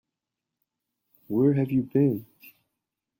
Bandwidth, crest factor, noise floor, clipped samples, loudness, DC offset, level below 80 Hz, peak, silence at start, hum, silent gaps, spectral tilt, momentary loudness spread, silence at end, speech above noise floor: 16.5 kHz; 18 dB; -87 dBFS; under 0.1%; -25 LUFS; under 0.1%; -66 dBFS; -12 dBFS; 1.3 s; none; none; -11.5 dB/octave; 8 LU; 0.7 s; 63 dB